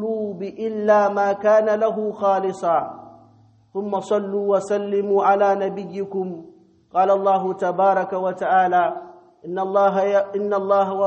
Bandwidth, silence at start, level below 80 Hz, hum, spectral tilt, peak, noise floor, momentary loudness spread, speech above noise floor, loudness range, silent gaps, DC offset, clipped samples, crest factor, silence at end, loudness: 8.4 kHz; 0 s; -70 dBFS; none; -6.5 dB/octave; -6 dBFS; -53 dBFS; 11 LU; 34 dB; 2 LU; none; under 0.1%; under 0.1%; 16 dB; 0 s; -20 LUFS